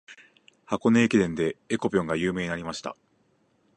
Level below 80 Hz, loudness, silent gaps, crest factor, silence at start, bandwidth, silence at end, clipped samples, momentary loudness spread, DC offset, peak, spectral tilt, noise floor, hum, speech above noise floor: -56 dBFS; -26 LUFS; none; 20 dB; 0.1 s; 10 kHz; 0.85 s; under 0.1%; 13 LU; under 0.1%; -8 dBFS; -6 dB/octave; -67 dBFS; none; 42 dB